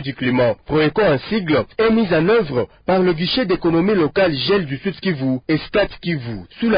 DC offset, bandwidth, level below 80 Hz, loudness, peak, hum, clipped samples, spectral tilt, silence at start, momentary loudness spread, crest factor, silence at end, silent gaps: under 0.1%; 5.2 kHz; -44 dBFS; -18 LUFS; -6 dBFS; none; under 0.1%; -11.5 dB/octave; 0 s; 7 LU; 12 dB; 0 s; none